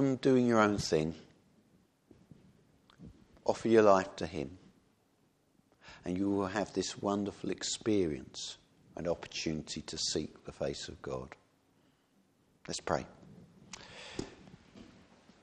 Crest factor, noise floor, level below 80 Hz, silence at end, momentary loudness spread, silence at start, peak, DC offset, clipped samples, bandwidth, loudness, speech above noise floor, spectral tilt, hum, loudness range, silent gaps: 24 dB; -72 dBFS; -62 dBFS; 0.6 s; 21 LU; 0 s; -12 dBFS; under 0.1%; under 0.1%; 12 kHz; -33 LUFS; 39 dB; -5 dB/octave; none; 10 LU; none